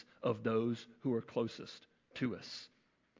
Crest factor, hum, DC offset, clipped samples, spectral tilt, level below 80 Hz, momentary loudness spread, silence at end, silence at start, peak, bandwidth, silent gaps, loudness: 18 dB; none; under 0.1%; under 0.1%; -6.5 dB/octave; -76 dBFS; 17 LU; 0.55 s; 0.2 s; -20 dBFS; 7.6 kHz; none; -39 LUFS